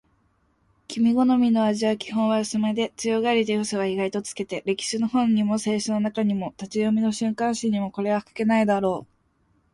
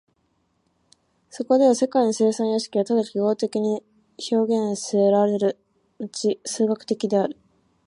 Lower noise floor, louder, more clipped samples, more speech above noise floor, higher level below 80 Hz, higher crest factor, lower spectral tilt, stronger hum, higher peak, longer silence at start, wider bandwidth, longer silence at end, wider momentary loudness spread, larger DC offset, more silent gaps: about the same, -66 dBFS vs -69 dBFS; about the same, -24 LUFS vs -22 LUFS; neither; second, 43 dB vs 47 dB; first, -64 dBFS vs -74 dBFS; about the same, 14 dB vs 16 dB; about the same, -5 dB/octave vs -5.5 dB/octave; neither; second, -10 dBFS vs -6 dBFS; second, 0.9 s vs 1.35 s; about the same, 11.5 kHz vs 11 kHz; first, 0.7 s vs 0.55 s; second, 7 LU vs 11 LU; neither; neither